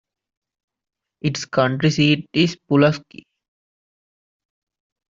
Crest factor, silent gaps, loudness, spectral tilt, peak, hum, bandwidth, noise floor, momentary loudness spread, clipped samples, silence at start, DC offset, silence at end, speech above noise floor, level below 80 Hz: 20 dB; none; -19 LUFS; -6 dB/octave; -2 dBFS; none; 7.6 kHz; under -90 dBFS; 8 LU; under 0.1%; 1.25 s; under 0.1%; 2.15 s; over 71 dB; -58 dBFS